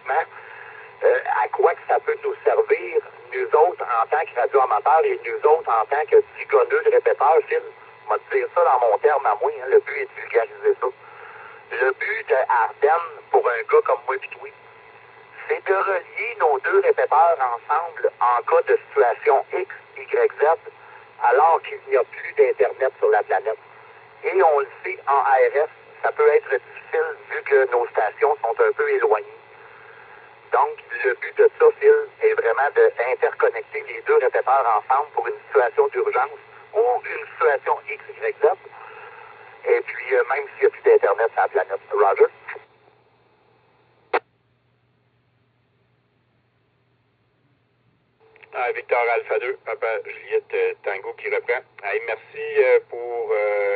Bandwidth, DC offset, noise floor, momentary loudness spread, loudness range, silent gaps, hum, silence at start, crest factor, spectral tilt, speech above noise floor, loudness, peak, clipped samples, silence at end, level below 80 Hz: 4.6 kHz; under 0.1%; -65 dBFS; 11 LU; 6 LU; none; none; 0.05 s; 18 dB; -8 dB/octave; 45 dB; -21 LUFS; -4 dBFS; under 0.1%; 0 s; -76 dBFS